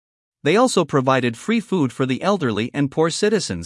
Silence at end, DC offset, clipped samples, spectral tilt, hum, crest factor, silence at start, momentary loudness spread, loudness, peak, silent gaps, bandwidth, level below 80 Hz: 0 s; under 0.1%; under 0.1%; -5 dB/octave; none; 16 dB; 0.45 s; 5 LU; -19 LUFS; -2 dBFS; none; 12 kHz; -62 dBFS